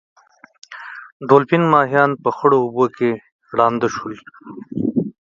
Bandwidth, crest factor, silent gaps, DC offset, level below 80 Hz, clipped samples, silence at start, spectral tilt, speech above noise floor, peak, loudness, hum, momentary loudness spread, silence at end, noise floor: 7.4 kHz; 18 dB; 1.12-1.20 s, 3.32-3.39 s; under 0.1%; -62 dBFS; under 0.1%; 0.7 s; -7 dB/octave; 19 dB; 0 dBFS; -17 LUFS; none; 21 LU; 0.15 s; -36 dBFS